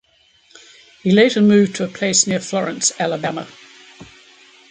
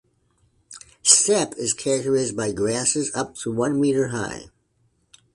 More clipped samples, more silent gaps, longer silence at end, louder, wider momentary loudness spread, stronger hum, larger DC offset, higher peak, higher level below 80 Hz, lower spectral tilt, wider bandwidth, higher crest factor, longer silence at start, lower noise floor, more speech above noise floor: neither; neither; second, 0.65 s vs 0.9 s; first, -16 LUFS vs -21 LUFS; second, 12 LU vs 15 LU; neither; neither; about the same, -2 dBFS vs 0 dBFS; second, -62 dBFS vs -56 dBFS; about the same, -4 dB/octave vs -3 dB/octave; second, 9.6 kHz vs 11.5 kHz; second, 18 dB vs 24 dB; first, 1.05 s vs 0.7 s; second, -55 dBFS vs -66 dBFS; second, 39 dB vs 43 dB